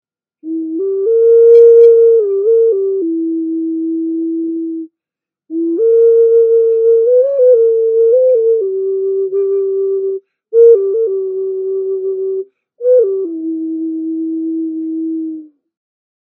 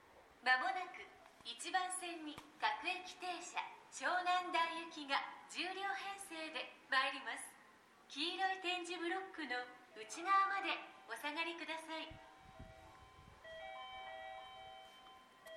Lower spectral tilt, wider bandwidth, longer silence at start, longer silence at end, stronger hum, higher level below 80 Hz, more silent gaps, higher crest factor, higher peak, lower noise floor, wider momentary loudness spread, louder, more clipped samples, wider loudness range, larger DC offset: first, -8.5 dB/octave vs -1 dB/octave; second, 1.5 kHz vs 14 kHz; first, 0.45 s vs 0 s; first, 0.95 s vs 0 s; neither; second, -84 dBFS vs -76 dBFS; neither; second, 12 dB vs 24 dB; first, 0 dBFS vs -20 dBFS; first, -87 dBFS vs -66 dBFS; second, 13 LU vs 21 LU; first, -12 LUFS vs -41 LUFS; neither; about the same, 8 LU vs 8 LU; neither